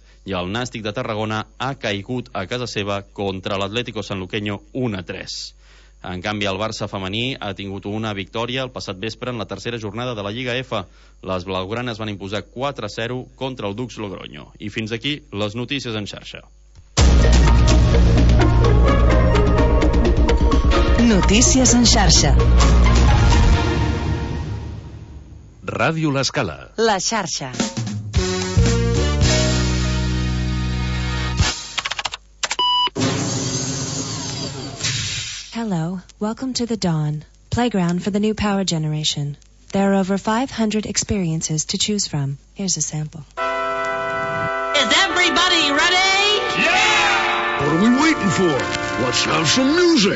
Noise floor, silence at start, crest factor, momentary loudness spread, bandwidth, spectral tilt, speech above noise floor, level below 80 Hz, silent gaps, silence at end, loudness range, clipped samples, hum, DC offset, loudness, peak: -39 dBFS; 0.25 s; 16 dB; 13 LU; 8 kHz; -4 dB/octave; 19 dB; -24 dBFS; none; 0 s; 11 LU; under 0.1%; none; under 0.1%; -19 LUFS; -2 dBFS